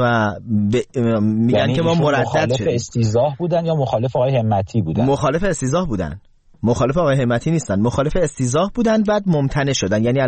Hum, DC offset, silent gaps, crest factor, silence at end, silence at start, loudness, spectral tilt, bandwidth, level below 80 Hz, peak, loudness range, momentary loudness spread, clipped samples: none; 0.1%; none; 10 dB; 0 s; 0 s; -18 LUFS; -6.5 dB/octave; 8.8 kHz; -38 dBFS; -6 dBFS; 2 LU; 4 LU; under 0.1%